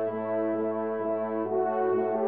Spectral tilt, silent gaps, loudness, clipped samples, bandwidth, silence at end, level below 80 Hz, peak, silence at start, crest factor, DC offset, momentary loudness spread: -7.5 dB/octave; none; -29 LUFS; under 0.1%; 3.8 kHz; 0 s; -80 dBFS; -16 dBFS; 0 s; 12 dB; 0.1%; 3 LU